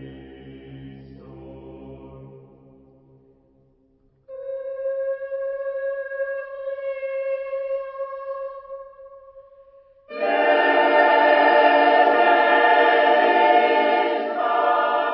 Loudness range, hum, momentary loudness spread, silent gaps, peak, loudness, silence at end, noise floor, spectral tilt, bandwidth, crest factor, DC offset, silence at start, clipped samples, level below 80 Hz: 16 LU; none; 24 LU; none; -4 dBFS; -19 LUFS; 0 s; -61 dBFS; -8.5 dB/octave; 5.8 kHz; 18 dB; under 0.1%; 0 s; under 0.1%; -60 dBFS